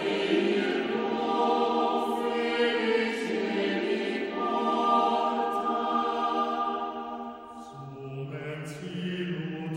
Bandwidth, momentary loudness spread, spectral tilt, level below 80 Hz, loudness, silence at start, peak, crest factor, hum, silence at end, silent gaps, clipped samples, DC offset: 16 kHz; 12 LU; -5.5 dB/octave; -68 dBFS; -28 LUFS; 0 s; -14 dBFS; 16 dB; none; 0 s; none; under 0.1%; under 0.1%